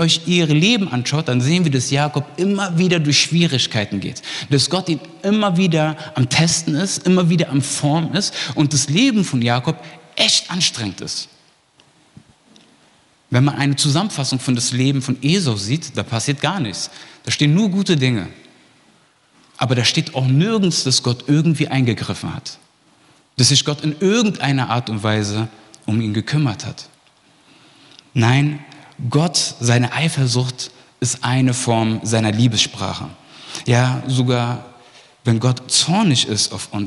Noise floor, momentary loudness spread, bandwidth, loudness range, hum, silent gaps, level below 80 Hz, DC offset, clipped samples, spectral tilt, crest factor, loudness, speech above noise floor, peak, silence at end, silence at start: -55 dBFS; 11 LU; 12 kHz; 4 LU; none; none; -58 dBFS; under 0.1%; under 0.1%; -4.5 dB/octave; 18 dB; -17 LUFS; 37 dB; 0 dBFS; 0 s; 0 s